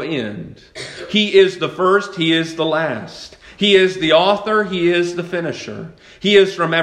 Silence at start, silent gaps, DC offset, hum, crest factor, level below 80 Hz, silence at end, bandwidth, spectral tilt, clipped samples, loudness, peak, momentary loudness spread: 0 s; none; under 0.1%; none; 16 dB; -54 dBFS; 0 s; 9.8 kHz; -5 dB/octave; under 0.1%; -16 LUFS; 0 dBFS; 20 LU